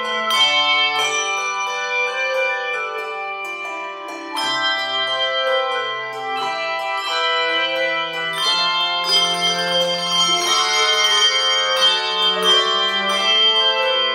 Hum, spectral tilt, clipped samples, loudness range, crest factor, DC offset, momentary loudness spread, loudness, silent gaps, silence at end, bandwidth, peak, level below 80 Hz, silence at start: none; 0 dB/octave; under 0.1%; 7 LU; 16 dB; under 0.1%; 11 LU; -17 LUFS; none; 0 s; 16.5 kHz; -4 dBFS; -86 dBFS; 0 s